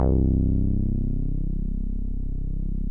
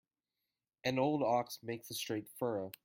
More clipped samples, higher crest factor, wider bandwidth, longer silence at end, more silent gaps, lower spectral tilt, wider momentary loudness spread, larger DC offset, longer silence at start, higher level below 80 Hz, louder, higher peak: neither; second, 14 dB vs 20 dB; second, 1.5 kHz vs 16.5 kHz; second, 0 s vs 0.15 s; neither; first, -14 dB/octave vs -5 dB/octave; about the same, 10 LU vs 9 LU; first, 1% vs under 0.1%; second, 0 s vs 0.85 s; first, -24 dBFS vs -78 dBFS; first, -27 LUFS vs -37 LUFS; first, -10 dBFS vs -18 dBFS